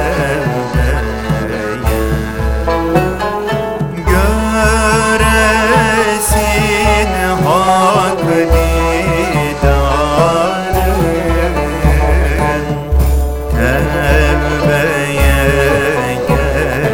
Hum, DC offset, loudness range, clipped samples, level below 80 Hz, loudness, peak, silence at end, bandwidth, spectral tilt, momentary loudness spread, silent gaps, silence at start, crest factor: none; under 0.1%; 4 LU; under 0.1%; -18 dBFS; -13 LUFS; 0 dBFS; 0 s; 17 kHz; -5.5 dB/octave; 7 LU; none; 0 s; 12 dB